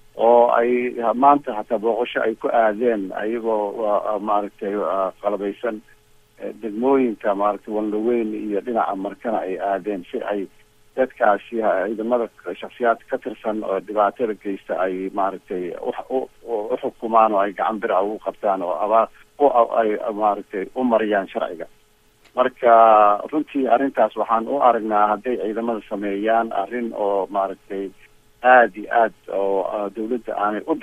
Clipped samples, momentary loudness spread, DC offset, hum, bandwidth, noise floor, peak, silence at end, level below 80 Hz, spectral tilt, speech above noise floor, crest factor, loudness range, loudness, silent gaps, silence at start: under 0.1%; 11 LU; under 0.1%; none; 12.5 kHz; -56 dBFS; -2 dBFS; 0 s; -60 dBFS; -7 dB/octave; 35 dB; 20 dB; 6 LU; -21 LUFS; none; 0.15 s